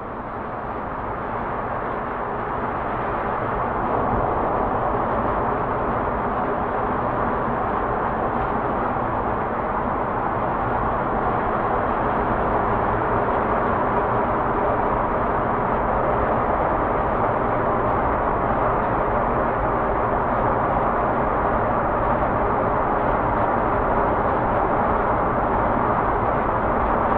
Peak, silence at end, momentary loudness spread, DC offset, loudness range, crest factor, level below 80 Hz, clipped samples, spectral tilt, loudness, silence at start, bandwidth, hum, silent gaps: -6 dBFS; 0 s; 4 LU; under 0.1%; 3 LU; 14 dB; -34 dBFS; under 0.1%; -10 dB/octave; -22 LUFS; 0 s; 4.9 kHz; none; none